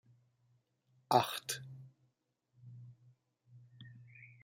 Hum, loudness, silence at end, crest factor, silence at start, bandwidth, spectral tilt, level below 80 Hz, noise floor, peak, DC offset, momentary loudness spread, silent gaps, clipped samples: none; -35 LUFS; 0.2 s; 30 dB; 1.1 s; 16 kHz; -3.5 dB/octave; -84 dBFS; -81 dBFS; -14 dBFS; under 0.1%; 25 LU; none; under 0.1%